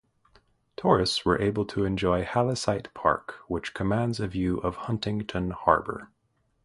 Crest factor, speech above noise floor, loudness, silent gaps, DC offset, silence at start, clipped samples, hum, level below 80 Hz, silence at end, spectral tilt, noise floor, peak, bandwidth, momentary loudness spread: 24 dB; 37 dB; -27 LUFS; none; under 0.1%; 0.8 s; under 0.1%; none; -48 dBFS; 0.6 s; -6 dB/octave; -63 dBFS; -4 dBFS; 11.5 kHz; 9 LU